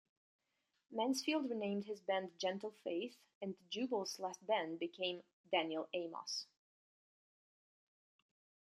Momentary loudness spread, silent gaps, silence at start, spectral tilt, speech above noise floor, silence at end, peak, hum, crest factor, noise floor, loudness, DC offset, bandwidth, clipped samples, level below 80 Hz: 10 LU; 3.35-3.41 s, 5.33-5.44 s; 0.9 s; -3.5 dB/octave; over 49 dB; 2.35 s; -22 dBFS; none; 22 dB; under -90 dBFS; -42 LUFS; under 0.1%; 13.5 kHz; under 0.1%; under -90 dBFS